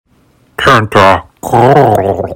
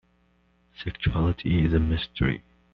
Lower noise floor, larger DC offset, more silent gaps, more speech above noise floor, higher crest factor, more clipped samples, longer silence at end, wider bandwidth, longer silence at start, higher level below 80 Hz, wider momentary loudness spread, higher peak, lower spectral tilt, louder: second, -49 dBFS vs -65 dBFS; neither; neither; about the same, 42 dB vs 40 dB; second, 10 dB vs 16 dB; first, 5% vs under 0.1%; second, 0 s vs 0.35 s; first, 20 kHz vs 5.4 kHz; second, 0.6 s vs 0.8 s; about the same, -38 dBFS vs -36 dBFS; second, 7 LU vs 13 LU; first, 0 dBFS vs -10 dBFS; about the same, -6 dB/octave vs -6 dB/octave; first, -8 LUFS vs -26 LUFS